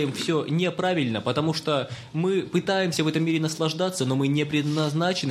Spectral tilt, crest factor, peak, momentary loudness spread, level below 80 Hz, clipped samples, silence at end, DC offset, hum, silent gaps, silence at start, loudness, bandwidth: -5.5 dB/octave; 16 dB; -10 dBFS; 2 LU; -64 dBFS; under 0.1%; 0 s; under 0.1%; none; none; 0 s; -25 LUFS; 15.5 kHz